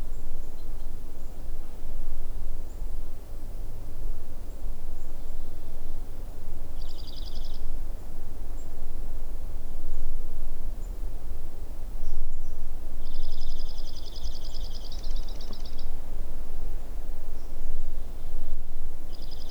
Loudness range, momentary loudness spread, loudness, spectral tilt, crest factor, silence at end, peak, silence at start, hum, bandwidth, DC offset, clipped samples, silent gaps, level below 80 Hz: 3 LU; 5 LU; -40 LUFS; -5.5 dB/octave; 10 dB; 0 s; -10 dBFS; 0 s; none; 5.4 kHz; under 0.1%; under 0.1%; none; -26 dBFS